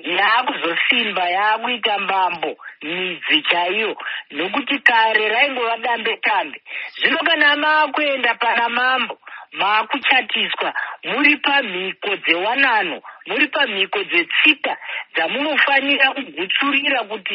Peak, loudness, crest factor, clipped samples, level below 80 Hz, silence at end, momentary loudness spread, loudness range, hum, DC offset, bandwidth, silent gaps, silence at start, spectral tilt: 0 dBFS; -17 LUFS; 18 dB; under 0.1%; -76 dBFS; 0 s; 11 LU; 2 LU; none; under 0.1%; 5.8 kHz; none; 0.05 s; 1.5 dB/octave